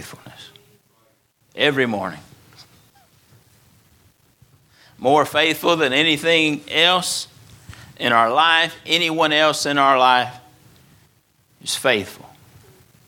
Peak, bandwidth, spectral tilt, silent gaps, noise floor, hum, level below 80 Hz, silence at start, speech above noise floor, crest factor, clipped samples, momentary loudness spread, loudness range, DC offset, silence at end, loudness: 0 dBFS; 19 kHz; -3 dB/octave; none; -61 dBFS; none; -62 dBFS; 0 s; 43 dB; 20 dB; under 0.1%; 14 LU; 9 LU; under 0.1%; 0.9 s; -17 LUFS